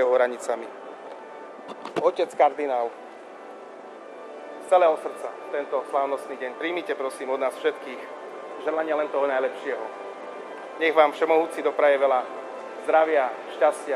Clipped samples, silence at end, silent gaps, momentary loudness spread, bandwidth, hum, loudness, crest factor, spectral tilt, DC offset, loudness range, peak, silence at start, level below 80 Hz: under 0.1%; 0 s; none; 20 LU; 13 kHz; none; -24 LUFS; 20 dB; -3.5 dB/octave; under 0.1%; 6 LU; -4 dBFS; 0 s; -86 dBFS